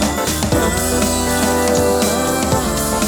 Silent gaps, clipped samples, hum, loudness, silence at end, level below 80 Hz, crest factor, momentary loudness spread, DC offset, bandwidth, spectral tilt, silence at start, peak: none; under 0.1%; none; -16 LUFS; 0 s; -28 dBFS; 14 dB; 2 LU; under 0.1%; over 20 kHz; -4 dB/octave; 0 s; -2 dBFS